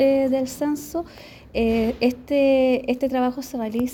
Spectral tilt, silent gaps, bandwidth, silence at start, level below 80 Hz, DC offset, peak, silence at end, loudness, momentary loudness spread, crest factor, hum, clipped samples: -5.5 dB/octave; none; 18 kHz; 0 s; -46 dBFS; under 0.1%; -8 dBFS; 0 s; -22 LUFS; 11 LU; 14 dB; none; under 0.1%